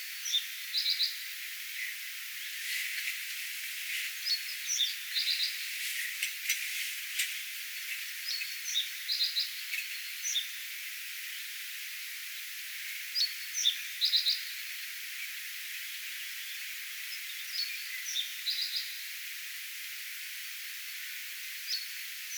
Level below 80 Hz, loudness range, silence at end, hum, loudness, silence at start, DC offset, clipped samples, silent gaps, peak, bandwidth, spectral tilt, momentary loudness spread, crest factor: under -90 dBFS; 5 LU; 0 s; none; -33 LUFS; 0 s; under 0.1%; under 0.1%; none; -14 dBFS; over 20 kHz; 12.5 dB/octave; 9 LU; 22 dB